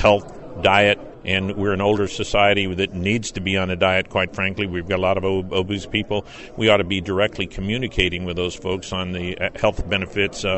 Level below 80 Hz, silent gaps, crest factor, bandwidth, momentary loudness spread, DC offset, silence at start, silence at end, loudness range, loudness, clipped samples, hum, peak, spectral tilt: -38 dBFS; none; 18 dB; 8.4 kHz; 8 LU; under 0.1%; 0 s; 0 s; 3 LU; -21 LUFS; under 0.1%; none; -2 dBFS; -5 dB/octave